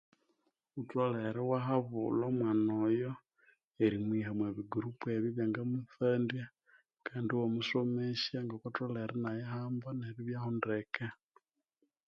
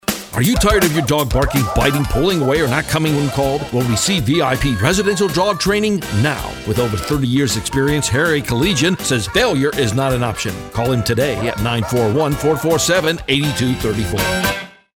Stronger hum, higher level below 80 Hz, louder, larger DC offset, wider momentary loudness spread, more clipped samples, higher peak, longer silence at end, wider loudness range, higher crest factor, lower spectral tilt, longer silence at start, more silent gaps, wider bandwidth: neither; second, -74 dBFS vs -30 dBFS; second, -36 LUFS vs -16 LUFS; neither; first, 9 LU vs 4 LU; neither; second, -18 dBFS vs 0 dBFS; first, 0.95 s vs 0.25 s; first, 4 LU vs 1 LU; about the same, 18 dB vs 16 dB; first, -8 dB/octave vs -4.5 dB/octave; first, 0.75 s vs 0.1 s; first, 3.64-3.71 s vs none; second, 7 kHz vs over 20 kHz